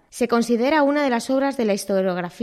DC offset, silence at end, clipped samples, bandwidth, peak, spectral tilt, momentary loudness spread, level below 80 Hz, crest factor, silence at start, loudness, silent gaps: under 0.1%; 0 s; under 0.1%; 14.5 kHz; -6 dBFS; -5 dB/octave; 4 LU; -62 dBFS; 14 dB; 0.15 s; -20 LUFS; none